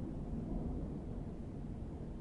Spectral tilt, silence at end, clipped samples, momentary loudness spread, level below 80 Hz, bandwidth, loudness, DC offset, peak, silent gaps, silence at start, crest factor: -10 dB/octave; 0 s; under 0.1%; 4 LU; -46 dBFS; 10.5 kHz; -44 LUFS; under 0.1%; -28 dBFS; none; 0 s; 14 dB